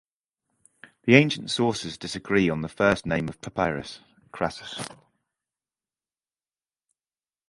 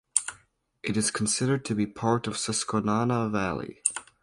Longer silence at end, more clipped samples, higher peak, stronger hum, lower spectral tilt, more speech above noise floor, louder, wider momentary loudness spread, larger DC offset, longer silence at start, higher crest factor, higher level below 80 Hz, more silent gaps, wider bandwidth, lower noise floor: first, 2.55 s vs 0.2 s; neither; about the same, 0 dBFS vs -2 dBFS; neither; first, -5.5 dB/octave vs -4 dB/octave; first, over 65 dB vs 35 dB; about the same, -25 LUFS vs -27 LUFS; first, 17 LU vs 5 LU; neither; first, 1.05 s vs 0.15 s; about the same, 28 dB vs 26 dB; about the same, -54 dBFS vs -58 dBFS; neither; about the same, 11.5 kHz vs 11.5 kHz; first, under -90 dBFS vs -62 dBFS